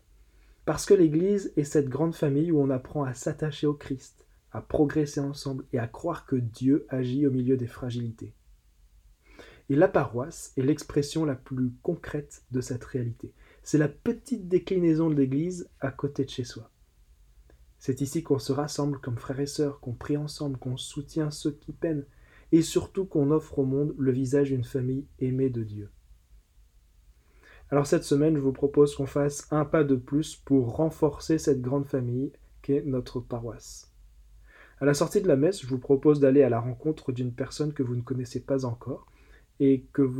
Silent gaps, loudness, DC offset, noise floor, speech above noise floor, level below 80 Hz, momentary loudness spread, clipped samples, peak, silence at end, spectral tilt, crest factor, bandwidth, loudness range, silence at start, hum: none; -27 LUFS; under 0.1%; -59 dBFS; 32 dB; -54 dBFS; 12 LU; under 0.1%; -8 dBFS; 0 s; -7 dB/octave; 20 dB; 14.5 kHz; 6 LU; 0.65 s; none